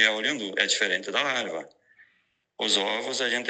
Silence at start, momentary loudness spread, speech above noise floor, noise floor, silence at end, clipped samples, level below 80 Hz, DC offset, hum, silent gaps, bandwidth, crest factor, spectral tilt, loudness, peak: 0 s; 8 LU; 44 dB; -70 dBFS; 0 s; under 0.1%; -84 dBFS; under 0.1%; none; none; 9.4 kHz; 22 dB; -0.5 dB/octave; -25 LUFS; -4 dBFS